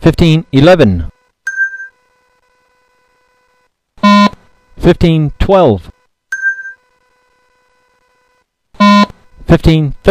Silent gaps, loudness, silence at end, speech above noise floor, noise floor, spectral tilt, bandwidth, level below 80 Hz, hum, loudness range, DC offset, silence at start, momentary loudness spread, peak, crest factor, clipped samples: none; -10 LUFS; 0 s; 51 dB; -59 dBFS; -7 dB/octave; 10.5 kHz; -26 dBFS; none; 6 LU; under 0.1%; 0 s; 16 LU; 0 dBFS; 12 dB; 0.9%